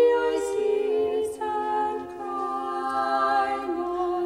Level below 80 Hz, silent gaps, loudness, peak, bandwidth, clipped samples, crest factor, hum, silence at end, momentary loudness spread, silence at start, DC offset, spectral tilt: -60 dBFS; none; -26 LUFS; -10 dBFS; 14 kHz; under 0.1%; 14 dB; none; 0 s; 7 LU; 0 s; under 0.1%; -4 dB/octave